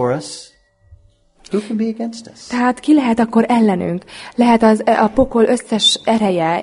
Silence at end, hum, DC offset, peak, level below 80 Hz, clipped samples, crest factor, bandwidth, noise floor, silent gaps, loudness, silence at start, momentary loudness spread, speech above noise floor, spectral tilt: 0 s; none; under 0.1%; 0 dBFS; -44 dBFS; under 0.1%; 16 dB; 11 kHz; -51 dBFS; none; -15 LUFS; 0 s; 14 LU; 36 dB; -4.5 dB/octave